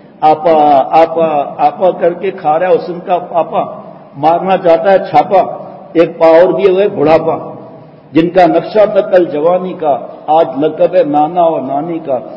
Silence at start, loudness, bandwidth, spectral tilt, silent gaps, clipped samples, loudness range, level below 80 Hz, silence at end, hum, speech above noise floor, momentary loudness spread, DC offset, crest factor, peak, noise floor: 0.2 s; -11 LUFS; 6.4 kHz; -8 dB/octave; none; 0.7%; 3 LU; -52 dBFS; 0 s; none; 24 dB; 9 LU; under 0.1%; 10 dB; 0 dBFS; -34 dBFS